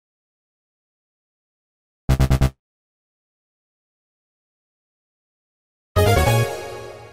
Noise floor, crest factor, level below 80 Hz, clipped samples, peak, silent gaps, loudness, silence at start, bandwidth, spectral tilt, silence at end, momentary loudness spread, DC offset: under -90 dBFS; 20 dB; -30 dBFS; under 0.1%; -4 dBFS; 2.59-5.95 s; -19 LUFS; 2.1 s; 16 kHz; -5.5 dB/octave; 0.05 s; 17 LU; under 0.1%